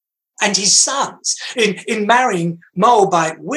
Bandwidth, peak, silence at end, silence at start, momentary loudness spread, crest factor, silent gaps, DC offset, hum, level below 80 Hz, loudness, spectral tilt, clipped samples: 12.5 kHz; 0 dBFS; 0 s; 0.4 s; 9 LU; 16 dB; none; under 0.1%; none; -70 dBFS; -15 LUFS; -2 dB/octave; under 0.1%